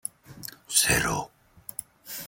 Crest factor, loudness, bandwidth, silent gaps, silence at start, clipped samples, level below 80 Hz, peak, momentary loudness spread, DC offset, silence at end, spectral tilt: 24 dB; -23 LUFS; 17 kHz; none; 0.3 s; under 0.1%; -50 dBFS; -6 dBFS; 21 LU; under 0.1%; 0 s; -1.5 dB/octave